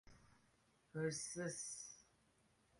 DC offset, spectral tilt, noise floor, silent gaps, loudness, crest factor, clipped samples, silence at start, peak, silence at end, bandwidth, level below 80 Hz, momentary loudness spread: under 0.1%; -3.5 dB/octave; -77 dBFS; none; -47 LUFS; 20 dB; under 0.1%; 0.05 s; -30 dBFS; 0.75 s; 11.5 kHz; -78 dBFS; 12 LU